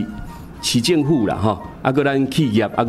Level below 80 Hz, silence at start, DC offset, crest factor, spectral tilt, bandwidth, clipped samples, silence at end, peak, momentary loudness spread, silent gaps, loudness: -42 dBFS; 0 s; under 0.1%; 16 dB; -5.5 dB/octave; 15 kHz; under 0.1%; 0 s; -2 dBFS; 11 LU; none; -18 LUFS